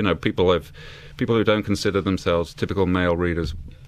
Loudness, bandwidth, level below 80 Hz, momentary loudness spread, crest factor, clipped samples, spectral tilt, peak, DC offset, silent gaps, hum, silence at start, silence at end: -22 LUFS; 14 kHz; -40 dBFS; 11 LU; 18 dB; under 0.1%; -6.5 dB/octave; -4 dBFS; under 0.1%; none; none; 0 s; 0 s